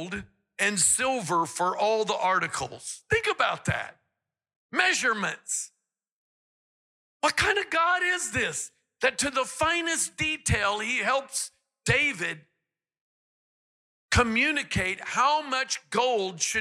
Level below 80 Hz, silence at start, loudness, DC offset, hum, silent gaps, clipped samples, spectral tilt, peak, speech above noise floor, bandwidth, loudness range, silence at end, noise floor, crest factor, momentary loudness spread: -52 dBFS; 0 s; -26 LUFS; under 0.1%; none; 4.56-4.70 s, 6.12-7.20 s, 13.01-14.08 s; under 0.1%; -2.5 dB/octave; -10 dBFS; 58 dB; 16 kHz; 4 LU; 0 s; -84 dBFS; 18 dB; 10 LU